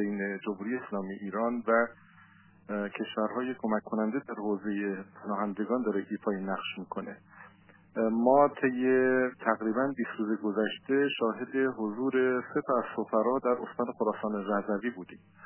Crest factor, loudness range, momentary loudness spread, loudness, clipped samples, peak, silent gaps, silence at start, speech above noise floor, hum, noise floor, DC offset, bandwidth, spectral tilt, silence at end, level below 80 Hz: 20 dB; 6 LU; 10 LU; -31 LUFS; under 0.1%; -10 dBFS; none; 0 s; 28 dB; none; -58 dBFS; under 0.1%; 3.2 kHz; -4.5 dB/octave; 0 s; -76 dBFS